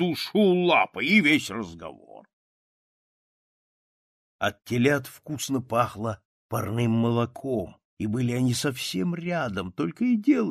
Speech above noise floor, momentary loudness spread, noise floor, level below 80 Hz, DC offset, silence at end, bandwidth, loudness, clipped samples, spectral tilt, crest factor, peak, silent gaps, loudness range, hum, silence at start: over 65 dB; 13 LU; under -90 dBFS; -62 dBFS; under 0.1%; 0 s; 14.5 kHz; -25 LUFS; under 0.1%; -5.5 dB/octave; 20 dB; -8 dBFS; 2.33-4.39 s, 6.25-6.49 s, 7.85-7.97 s; 7 LU; none; 0 s